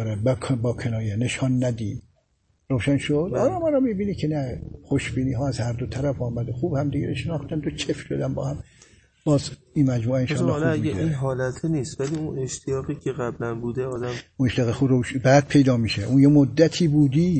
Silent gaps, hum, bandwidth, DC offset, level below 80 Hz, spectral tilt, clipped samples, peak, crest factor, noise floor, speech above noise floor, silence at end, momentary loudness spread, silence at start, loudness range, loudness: none; none; 8.8 kHz; under 0.1%; -46 dBFS; -7 dB/octave; under 0.1%; -2 dBFS; 20 dB; -67 dBFS; 44 dB; 0 s; 10 LU; 0 s; 7 LU; -23 LUFS